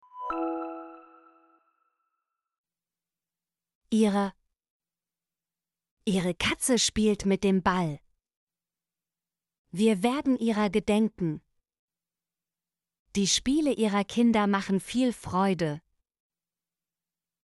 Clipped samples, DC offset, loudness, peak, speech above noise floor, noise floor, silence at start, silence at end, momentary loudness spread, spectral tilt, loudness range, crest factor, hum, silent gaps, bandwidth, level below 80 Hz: under 0.1%; under 0.1%; -27 LUFS; -12 dBFS; over 64 dB; under -90 dBFS; 0.15 s; 1.65 s; 11 LU; -4.5 dB/octave; 7 LU; 18 dB; none; 2.58-2.64 s, 3.75-3.81 s, 4.70-4.80 s, 5.91-5.97 s, 8.37-8.47 s, 9.58-9.65 s, 11.79-11.88 s, 12.99-13.06 s; 11.5 kHz; -56 dBFS